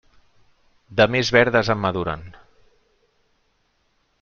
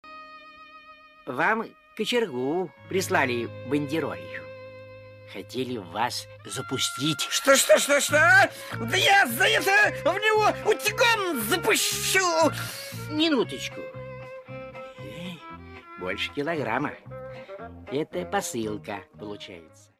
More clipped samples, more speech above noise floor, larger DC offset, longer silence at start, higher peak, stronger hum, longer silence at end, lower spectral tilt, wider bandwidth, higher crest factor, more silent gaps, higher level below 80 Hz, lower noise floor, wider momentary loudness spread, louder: neither; first, 48 dB vs 25 dB; neither; first, 0.9 s vs 0.05 s; first, -2 dBFS vs -6 dBFS; neither; first, 1.9 s vs 0.35 s; first, -5 dB/octave vs -2.5 dB/octave; second, 7.2 kHz vs 15.5 kHz; about the same, 22 dB vs 20 dB; neither; first, -50 dBFS vs -60 dBFS; first, -67 dBFS vs -50 dBFS; second, 12 LU vs 22 LU; first, -19 LUFS vs -24 LUFS